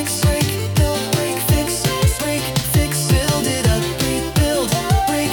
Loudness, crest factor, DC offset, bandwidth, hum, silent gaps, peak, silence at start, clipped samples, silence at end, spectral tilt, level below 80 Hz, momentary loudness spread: -18 LUFS; 14 dB; under 0.1%; 19 kHz; none; none; -4 dBFS; 0 s; under 0.1%; 0 s; -4.5 dB/octave; -28 dBFS; 3 LU